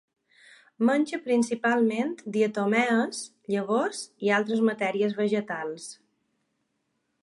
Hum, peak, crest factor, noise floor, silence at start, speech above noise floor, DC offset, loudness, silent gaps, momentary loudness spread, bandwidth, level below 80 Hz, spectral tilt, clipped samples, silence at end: none; -10 dBFS; 18 dB; -77 dBFS; 0.8 s; 51 dB; under 0.1%; -26 LUFS; none; 9 LU; 11.5 kHz; -78 dBFS; -5 dB/octave; under 0.1%; 1.3 s